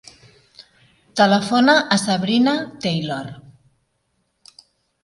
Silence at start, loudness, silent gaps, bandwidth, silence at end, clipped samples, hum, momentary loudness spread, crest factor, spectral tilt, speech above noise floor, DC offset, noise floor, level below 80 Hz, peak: 1.15 s; -18 LUFS; none; 11.5 kHz; 1.65 s; under 0.1%; none; 14 LU; 20 dB; -4.5 dB/octave; 52 dB; under 0.1%; -69 dBFS; -62 dBFS; 0 dBFS